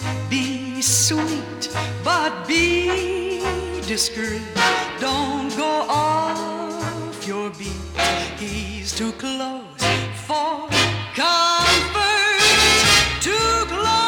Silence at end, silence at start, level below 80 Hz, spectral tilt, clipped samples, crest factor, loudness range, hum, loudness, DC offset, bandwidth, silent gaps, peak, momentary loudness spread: 0 s; 0 s; -40 dBFS; -2.5 dB/octave; under 0.1%; 16 dB; 9 LU; none; -19 LUFS; under 0.1%; 18 kHz; none; -4 dBFS; 13 LU